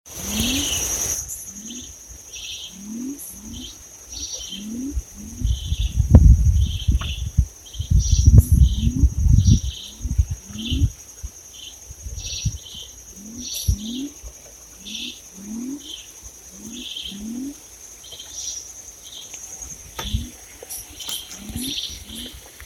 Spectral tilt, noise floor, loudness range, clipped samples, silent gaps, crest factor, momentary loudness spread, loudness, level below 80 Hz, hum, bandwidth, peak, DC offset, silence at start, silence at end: -4.5 dB/octave; -43 dBFS; 14 LU; under 0.1%; none; 22 dB; 20 LU; -23 LUFS; -24 dBFS; none; 17 kHz; 0 dBFS; under 0.1%; 0.05 s; 0 s